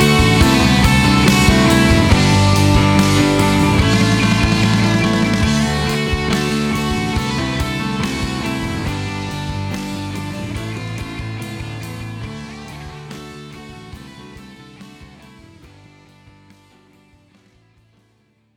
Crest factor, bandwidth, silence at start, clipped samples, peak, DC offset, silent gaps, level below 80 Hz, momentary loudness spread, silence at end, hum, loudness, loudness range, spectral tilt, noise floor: 16 dB; 18.5 kHz; 0 s; under 0.1%; 0 dBFS; under 0.1%; none; -28 dBFS; 21 LU; 3.5 s; none; -15 LUFS; 20 LU; -5 dB/octave; -59 dBFS